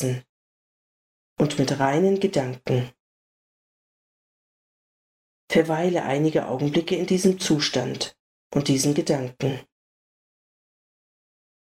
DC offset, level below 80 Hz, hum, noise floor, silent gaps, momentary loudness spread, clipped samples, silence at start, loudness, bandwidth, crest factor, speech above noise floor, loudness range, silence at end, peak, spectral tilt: under 0.1%; -60 dBFS; none; under -90 dBFS; 0.29-1.36 s, 3.00-5.48 s, 8.20-8.50 s; 8 LU; under 0.1%; 0 s; -23 LUFS; 16 kHz; 20 dB; over 67 dB; 6 LU; 2 s; -6 dBFS; -5 dB/octave